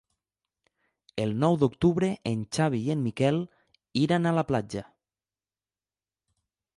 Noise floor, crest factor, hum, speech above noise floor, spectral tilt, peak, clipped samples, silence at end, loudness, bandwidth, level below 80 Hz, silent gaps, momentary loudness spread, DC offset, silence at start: under -90 dBFS; 18 dB; none; over 64 dB; -7 dB/octave; -10 dBFS; under 0.1%; 1.95 s; -27 LUFS; 11.5 kHz; -58 dBFS; none; 10 LU; under 0.1%; 1.15 s